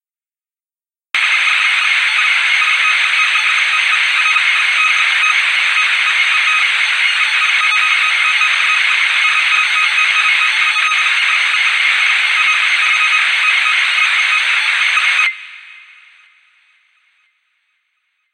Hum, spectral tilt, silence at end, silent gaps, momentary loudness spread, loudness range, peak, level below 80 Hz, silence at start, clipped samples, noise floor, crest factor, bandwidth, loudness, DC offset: none; 6 dB/octave; 2.6 s; none; 1 LU; 3 LU; 0 dBFS; -86 dBFS; 1.15 s; under 0.1%; under -90 dBFS; 14 dB; 13.5 kHz; -11 LUFS; under 0.1%